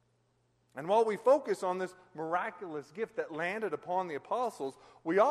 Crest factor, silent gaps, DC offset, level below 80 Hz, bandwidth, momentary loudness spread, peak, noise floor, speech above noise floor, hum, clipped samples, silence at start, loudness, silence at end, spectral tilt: 20 dB; none; under 0.1%; -82 dBFS; 13 kHz; 14 LU; -14 dBFS; -73 dBFS; 41 dB; none; under 0.1%; 0.75 s; -33 LUFS; 0 s; -5.5 dB/octave